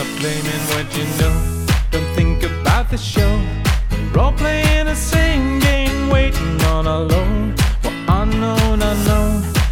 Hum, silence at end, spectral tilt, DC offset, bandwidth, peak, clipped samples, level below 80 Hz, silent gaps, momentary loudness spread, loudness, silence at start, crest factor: none; 0 s; -5.5 dB/octave; under 0.1%; 18 kHz; -2 dBFS; under 0.1%; -18 dBFS; none; 4 LU; -17 LUFS; 0 s; 14 dB